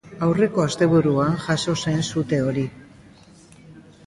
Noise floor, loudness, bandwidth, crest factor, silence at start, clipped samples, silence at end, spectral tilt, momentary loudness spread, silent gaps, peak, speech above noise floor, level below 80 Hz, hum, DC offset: -48 dBFS; -21 LUFS; 11.5 kHz; 16 dB; 0.05 s; under 0.1%; 0.25 s; -6 dB/octave; 6 LU; none; -6 dBFS; 28 dB; -52 dBFS; none; under 0.1%